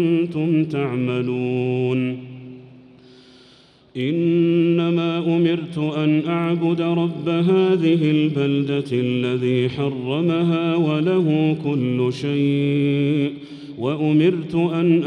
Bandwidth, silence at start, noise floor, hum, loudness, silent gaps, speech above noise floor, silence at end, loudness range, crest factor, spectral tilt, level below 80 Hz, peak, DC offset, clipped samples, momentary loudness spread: 9.2 kHz; 0 s; -51 dBFS; none; -20 LUFS; none; 32 dB; 0 s; 4 LU; 14 dB; -8.5 dB/octave; -62 dBFS; -6 dBFS; under 0.1%; under 0.1%; 7 LU